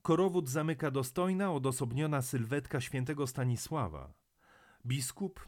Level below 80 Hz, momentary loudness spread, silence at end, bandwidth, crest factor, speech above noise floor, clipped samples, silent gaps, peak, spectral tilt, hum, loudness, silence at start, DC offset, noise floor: -60 dBFS; 7 LU; 0 s; 17.5 kHz; 18 dB; 31 dB; under 0.1%; none; -16 dBFS; -6 dB/octave; none; -34 LUFS; 0.05 s; under 0.1%; -65 dBFS